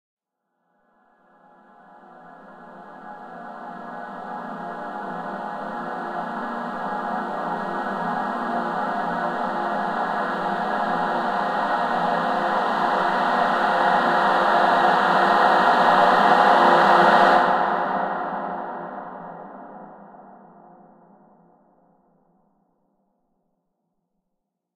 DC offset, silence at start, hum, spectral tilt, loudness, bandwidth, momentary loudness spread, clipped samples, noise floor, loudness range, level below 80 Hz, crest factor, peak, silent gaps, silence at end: under 0.1%; 2.1 s; none; -5.5 dB/octave; -21 LUFS; 13 kHz; 21 LU; under 0.1%; -79 dBFS; 20 LU; -64 dBFS; 20 dB; -4 dBFS; none; 4.4 s